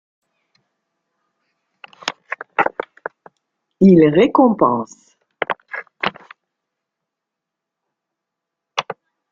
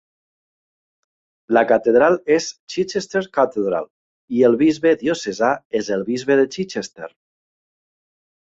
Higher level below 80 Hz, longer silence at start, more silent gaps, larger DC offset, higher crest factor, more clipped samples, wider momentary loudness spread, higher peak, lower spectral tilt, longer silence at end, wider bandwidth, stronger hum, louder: about the same, -58 dBFS vs -62 dBFS; first, 2.05 s vs 1.5 s; second, none vs 2.60-2.67 s, 3.90-4.28 s, 5.65-5.70 s; neither; about the same, 20 dB vs 18 dB; neither; first, 22 LU vs 12 LU; about the same, -2 dBFS vs -2 dBFS; first, -7 dB/octave vs -5 dB/octave; second, 0.4 s vs 1.4 s; about the same, 7.4 kHz vs 8 kHz; neither; about the same, -17 LUFS vs -19 LUFS